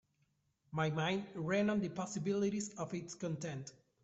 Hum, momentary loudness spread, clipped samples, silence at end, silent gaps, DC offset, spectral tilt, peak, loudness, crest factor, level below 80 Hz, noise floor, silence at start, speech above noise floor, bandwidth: none; 10 LU; under 0.1%; 0.3 s; none; under 0.1%; -5.5 dB/octave; -20 dBFS; -38 LUFS; 18 dB; -74 dBFS; -79 dBFS; 0.7 s; 41 dB; 8.2 kHz